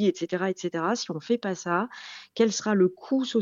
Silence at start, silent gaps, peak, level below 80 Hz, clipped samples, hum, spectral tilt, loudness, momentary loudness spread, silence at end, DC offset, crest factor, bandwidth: 0 s; none; -10 dBFS; -76 dBFS; under 0.1%; none; -5 dB/octave; -27 LUFS; 7 LU; 0 s; under 0.1%; 16 dB; 7.6 kHz